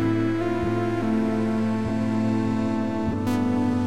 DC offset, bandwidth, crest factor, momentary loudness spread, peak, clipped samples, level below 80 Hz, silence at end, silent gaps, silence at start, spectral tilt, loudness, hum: 1%; 12.5 kHz; 12 dB; 2 LU; -12 dBFS; under 0.1%; -46 dBFS; 0 s; none; 0 s; -8 dB/octave; -24 LUFS; none